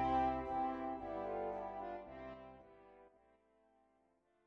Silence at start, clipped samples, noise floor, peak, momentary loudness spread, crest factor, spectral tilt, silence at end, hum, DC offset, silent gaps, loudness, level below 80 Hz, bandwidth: 0 s; under 0.1%; -77 dBFS; -26 dBFS; 22 LU; 18 dB; -8 dB/octave; 1.4 s; none; under 0.1%; none; -42 LUFS; -62 dBFS; 6.6 kHz